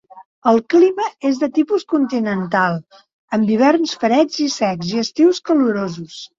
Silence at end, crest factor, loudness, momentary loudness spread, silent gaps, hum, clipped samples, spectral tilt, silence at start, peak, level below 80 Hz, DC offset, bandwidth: 0.15 s; 14 dB; -17 LUFS; 7 LU; 0.25-0.42 s, 3.13-3.28 s; none; under 0.1%; -5.5 dB/octave; 0.15 s; -2 dBFS; -62 dBFS; under 0.1%; 7.6 kHz